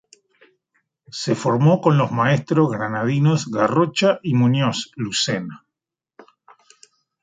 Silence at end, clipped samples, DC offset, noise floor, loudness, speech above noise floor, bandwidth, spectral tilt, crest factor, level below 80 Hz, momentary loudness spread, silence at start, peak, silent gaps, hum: 1.65 s; under 0.1%; under 0.1%; -85 dBFS; -19 LUFS; 66 dB; 9.4 kHz; -6 dB/octave; 18 dB; -62 dBFS; 8 LU; 1.15 s; -4 dBFS; none; none